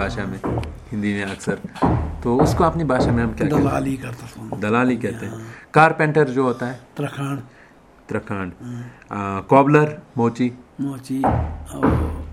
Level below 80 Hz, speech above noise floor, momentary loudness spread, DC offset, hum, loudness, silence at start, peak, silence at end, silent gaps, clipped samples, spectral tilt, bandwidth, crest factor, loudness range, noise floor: -36 dBFS; 28 dB; 15 LU; under 0.1%; none; -21 LUFS; 0 s; 0 dBFS; 0 s; none; under 0.1%; -7.5 dB/octave; 14.5 kHz; 20 dB; 2 LU; -48 dBFS